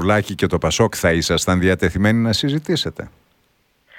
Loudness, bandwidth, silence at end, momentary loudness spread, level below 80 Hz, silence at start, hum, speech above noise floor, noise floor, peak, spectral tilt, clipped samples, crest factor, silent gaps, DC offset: -18 LUFS; 17.5 kHz; 0.9 s; 5 LU; -38 dBFS; 0 s; none; 44 dB; -62 dBFS; -2 dBFS; -5 dB/octave; under 0.1%; 16 dB; none; under 0.1%